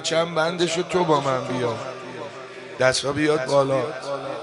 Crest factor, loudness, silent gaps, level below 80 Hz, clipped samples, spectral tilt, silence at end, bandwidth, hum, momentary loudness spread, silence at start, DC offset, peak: 20 dB; -22 LUFS; none; -60 dBFS; under 0.1%; -4.5 dB/octave; 0 s; 11.5 kHz; none; 14 LU; 0 s; under 0.1%; -2 dBFS